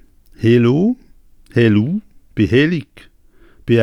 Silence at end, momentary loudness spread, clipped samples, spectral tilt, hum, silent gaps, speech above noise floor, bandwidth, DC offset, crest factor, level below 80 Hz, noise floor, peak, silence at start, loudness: 0 s; 14 LU; under 0.1%; -8.5 dB/octave; none; none; 33 dB; 10.5 kHz; under 0.1%; 16 dB; -46 dBFS; -47 dBFS; -2 dBFS; 0.4 s; -16 LUFS